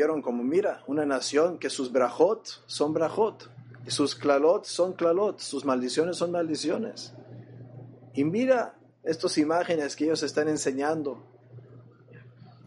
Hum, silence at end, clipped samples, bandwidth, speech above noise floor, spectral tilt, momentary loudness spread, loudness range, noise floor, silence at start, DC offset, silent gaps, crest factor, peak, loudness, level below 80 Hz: none; 0.15 s; under 0.1%; 11.5 kHz; 25 dB; -4.5 dB/octave; 18 LU; 3 LU; -51 dBFS; 0 s; under 0.1%; none; 20 dB; -8 dBFS; -27 LUFS; -78 dBFS